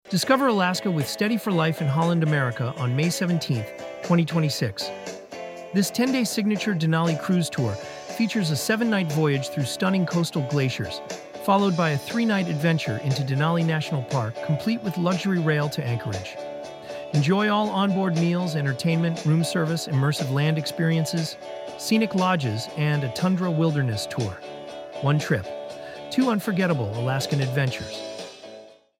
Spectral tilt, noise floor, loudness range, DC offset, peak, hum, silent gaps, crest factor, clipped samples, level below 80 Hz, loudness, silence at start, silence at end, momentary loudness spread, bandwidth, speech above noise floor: -6 dB/octave; -46 dBFS; 3 LU; under 0.1%; -6 dBFS; none; none; 18 dB; under 0.1%; -62 dBFS; -24 LUFS; 0.05 s; 0.25 s; 13 LU; 16 kHz; 23 dB